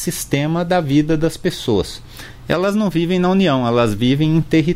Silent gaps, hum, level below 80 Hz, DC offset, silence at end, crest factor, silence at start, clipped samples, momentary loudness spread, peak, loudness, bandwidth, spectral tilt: none; none; -38 dBFS; under 0.1%; 0 s; 14 dB; 0 s; under 0.1%; 7 LU; -2 dBFS; -17 LUFS; 16 kHz; -6 dB/octave